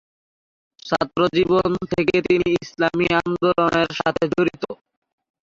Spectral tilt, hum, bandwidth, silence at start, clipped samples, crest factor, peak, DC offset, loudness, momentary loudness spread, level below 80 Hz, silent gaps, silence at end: -6 dB/octave; none; 7.6 kHz; 0.85 s; under 0.1%; 16 dB; -4 dBFS; under 0.1%; -20 LUFS; 7 LU; -50 dBFS; none; 0.7 s